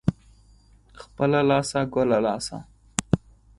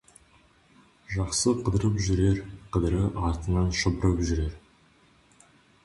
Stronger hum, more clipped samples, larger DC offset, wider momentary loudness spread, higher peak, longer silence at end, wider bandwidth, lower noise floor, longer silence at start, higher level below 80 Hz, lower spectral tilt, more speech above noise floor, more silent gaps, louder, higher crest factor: neither; neither; neither; first, 10 LU vs 7 LU; first, 0 dBFS vs -12 dBFS; second, 0.4 s vs 1.25 s; about the same, 11.5 kHz vs 11.5 kHz; second, -55 dBFS vs -60 dBFS; second, 0.05 s vs 1.1 s; second, -48 dBFS vs -36 dBFS; about the same, -5.5 dB/octave vs -5.5 dB/octave; about the same, 32 dB vs 35 dB; neither; first, -24 LUFS vs -27 LUFS; first, 26 dB vs 16 dB